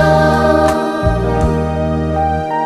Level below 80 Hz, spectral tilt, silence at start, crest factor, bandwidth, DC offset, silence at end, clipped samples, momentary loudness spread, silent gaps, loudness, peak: -24 dBFS; -7 dB/octave; 0 s; 14 dB; 13.5 kHz; under 0.1%; 0 s; under 0.1%; 5 LU; none; -14 LUFS; 0 dBFS